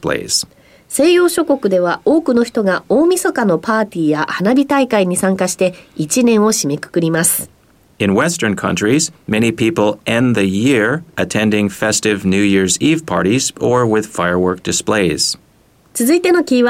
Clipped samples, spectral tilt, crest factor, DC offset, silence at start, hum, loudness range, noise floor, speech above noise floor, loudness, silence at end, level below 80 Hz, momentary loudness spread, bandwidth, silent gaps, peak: under 0.1%; -4 dB/octave; 12 dB; under 0.1%; 0.05 s; none; 1 LU; -51 dBFS; 37 dB; -14 LUFS; 0 s; -50 dBFS; 5 LU; 16.5 kHz; none; -2 dBFS